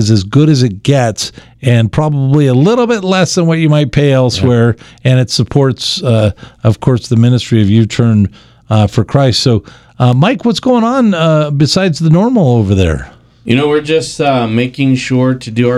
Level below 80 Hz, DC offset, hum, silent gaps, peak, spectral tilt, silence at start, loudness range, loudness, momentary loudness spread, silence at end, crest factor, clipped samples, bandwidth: -36 dBFS; under 0.1%; none; none; 0 dBFS; -6.5 dB/octave; 0 s; 1 LU; -11 LUFS; 5 LU; 0 s; 10 dB; 0.2%; 12 kHz